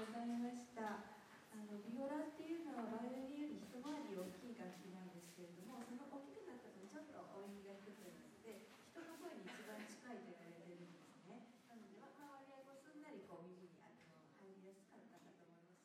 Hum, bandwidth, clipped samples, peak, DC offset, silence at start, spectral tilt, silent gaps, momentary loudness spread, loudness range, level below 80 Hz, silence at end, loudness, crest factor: none; 16 kHz; under 0.1%; -36 dBFS; under 0.1%; 0 s; -5.5 dB/octave; none; 16 LU; 11 LU; under -90 dBFS; 0 s; -54 LUFS; 18 dB